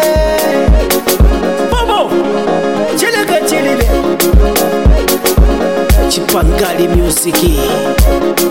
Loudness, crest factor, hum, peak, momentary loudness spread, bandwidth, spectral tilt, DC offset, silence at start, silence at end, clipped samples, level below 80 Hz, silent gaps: -11 LUFS; 10 dB; none; 0 dBFS; 3 LU; 17 kHz; -4.5 dB/octave; 1%; 0 s; 0 s; under 0.1%; -14 dBFS; none